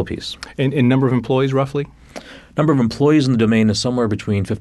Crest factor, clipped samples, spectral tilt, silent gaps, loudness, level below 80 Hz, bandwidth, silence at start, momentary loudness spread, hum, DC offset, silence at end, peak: 14 dB; under 0.1%; -6.5 dB/octave; none; -17 LUFS; -46 dBFS; 12 kHz; 0 s; 13 LU; none; under 0.1%; 0 s; -4 dBFS